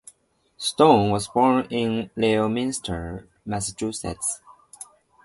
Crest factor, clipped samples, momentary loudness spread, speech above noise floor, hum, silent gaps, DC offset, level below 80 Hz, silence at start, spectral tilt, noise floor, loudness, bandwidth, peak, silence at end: 22 dB; under 0.1%; 20 LU; 40 dB; none; none; under 0.1%; -48 dBFS; 0.6 s; -4.5 dB/octave; -62 dBFS; -23 LUFS; 12 kHz; -2 dBFS; 0.4 s